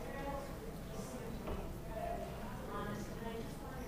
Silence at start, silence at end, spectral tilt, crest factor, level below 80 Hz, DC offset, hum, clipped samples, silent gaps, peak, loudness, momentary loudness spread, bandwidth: 0 s; 0 s; -6 dB/octave; 14 dB; -50 dBFS; under 0.1%; none; under 0.1%; none; -28 dBFS; -45 LUFS; 4 LU; 15.5 kHz